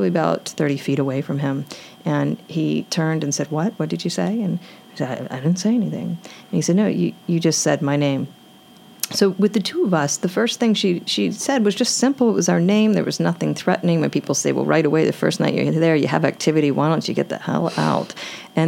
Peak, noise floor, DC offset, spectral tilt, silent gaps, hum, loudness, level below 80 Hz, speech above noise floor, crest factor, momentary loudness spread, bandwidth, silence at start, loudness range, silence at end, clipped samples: -2 dBFS; -46 dBFS; under 0.1%; -5 dB/octave; none; none; -20 LUFS; -70 dBFS; 27 dB; 18 dB; 8 LU; 17 kHz; 0 s; 4 LU; 0 s; under 0.1%